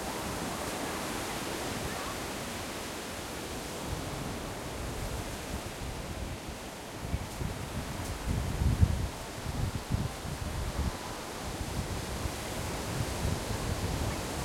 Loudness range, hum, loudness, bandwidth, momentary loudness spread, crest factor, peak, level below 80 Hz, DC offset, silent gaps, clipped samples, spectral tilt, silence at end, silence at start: 5 LU; none; -36 LUFS; 16.5 kHz; 5 LU; 24 dB; -10 dBFS; -42 dBFS; under 0.1%; none; under 0.1%; -4.5 dB/octave; 0 s; 0 s